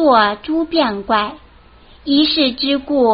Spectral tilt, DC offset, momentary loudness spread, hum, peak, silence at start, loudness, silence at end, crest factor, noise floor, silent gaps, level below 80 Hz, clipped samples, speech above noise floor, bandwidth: -1 dB/octave; under 0.1%; 7 LU; none; 0 dBFS; 0 s; -16 LUFS; 0 s; 16 dB; -44 dBFS; none; -46 dBFS; under 0.1%; 29 dB; 5.4 kHz